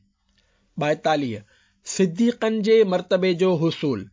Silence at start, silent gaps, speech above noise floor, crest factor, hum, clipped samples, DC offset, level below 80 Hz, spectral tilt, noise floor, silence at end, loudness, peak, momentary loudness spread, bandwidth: 0.75 s; none; 44 dB; 14 dB; none; under 0.1%; under 0.1%; -62 dBFS; -5.5 dB/octave; -65 dBFS; 0.05 s; -21 LUFS; -8 dBFS; 13 LU; 7.6 kHz